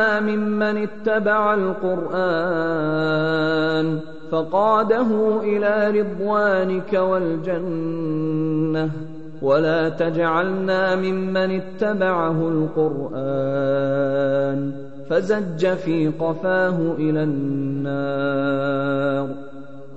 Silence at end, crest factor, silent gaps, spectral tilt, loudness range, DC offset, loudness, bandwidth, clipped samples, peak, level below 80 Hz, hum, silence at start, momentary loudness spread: 0 s; 14 dB; none; -8 dB/octave; 2 LU; 2%; -21 LUFS; 8 kHz; under 0.1%; -6 dBFS; -62 dBFS; none; 0 s; 6 LU